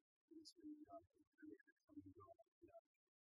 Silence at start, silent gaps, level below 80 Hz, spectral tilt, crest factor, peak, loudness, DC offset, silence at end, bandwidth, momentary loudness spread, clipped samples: 0.3 s; 0.52-0.56 s, 1.27-1.32 s, 1.72-1.77 s, 1.84-1.88 s, 2.48-2.61 s; under -90 dBFS; -4.5 dB/octave; 16 dB; -50 dBFS; -65 LUFS; under 0.1%; 0.4 s; 5 kHz; 8 LU; under 0.1%